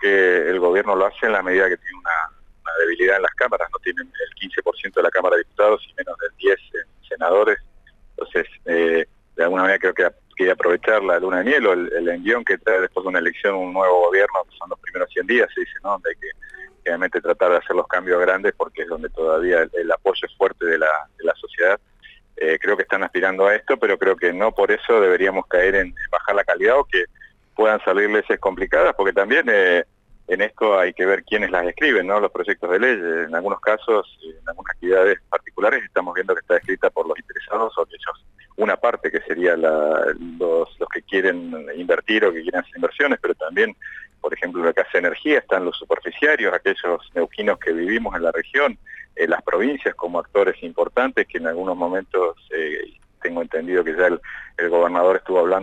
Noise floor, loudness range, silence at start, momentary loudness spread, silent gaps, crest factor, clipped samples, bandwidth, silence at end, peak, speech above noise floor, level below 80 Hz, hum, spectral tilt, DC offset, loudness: -49 dBFS; 4 LU; 0 s; 10 LU; none; 14 dB; under 0.1%; 8 kHz; 0 s; -6 dBFS; 30 dB; -50 dBFS; none; -5 dB/octave; under 0.1%; -20 LUFS